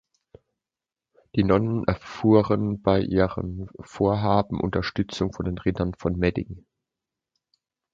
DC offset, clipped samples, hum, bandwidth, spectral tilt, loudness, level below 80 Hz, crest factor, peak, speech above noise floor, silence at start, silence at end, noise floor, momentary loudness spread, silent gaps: under 0.1%; under 0.1%; none; 7.6 kHz; -8 dB/octave; -24 LUFS; -44 dBFS; 20 dB; -4 dBFS; 66 dB; 1.35 s; 1.35 s; -90 dBFS; 13 LU; none